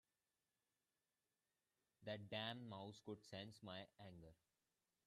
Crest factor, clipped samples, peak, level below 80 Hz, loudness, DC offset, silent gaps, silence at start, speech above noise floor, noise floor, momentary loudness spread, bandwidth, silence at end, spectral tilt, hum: 24 dB; under 0.1%; -34 dBFS; -86 dBFS; -54 LUFS; under 0.1%; none; 2 s; over 36 dB; under -90 dBFS; 13 LU; 13 kHz; 0.75 s; -5.5 dB/octave; none